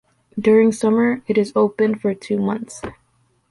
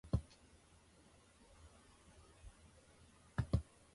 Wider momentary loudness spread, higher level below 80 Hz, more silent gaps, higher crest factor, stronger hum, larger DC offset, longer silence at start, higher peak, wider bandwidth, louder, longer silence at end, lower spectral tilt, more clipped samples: second, 18 LU vs 25 LU; about the same, -56 dBFS vs -52 dBFS; neither; second, 14 dB vs 26 dB; neither; neither; first, 0.35 s vs 0.05 s; first, -4 dBFS vs -22 dBFS; about the same, 11.5 kHz vs 11.5 kHz; first, -18 LUFS vs -43 LUFS; first, 0.6 s vs 0.3 s; about the same, -6.5 dB/octave vs -7.5 dB/octave; neither